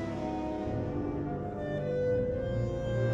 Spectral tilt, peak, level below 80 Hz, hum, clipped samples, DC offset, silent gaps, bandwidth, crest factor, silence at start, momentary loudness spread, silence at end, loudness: -8.5 dB/octave; -20 dBFS; -46 dBFS; none; under 0.1%; under 0.1%; none; 7.8 kHz; 12 dB; 0 s; 5 LU; 0 s; -33 LUFS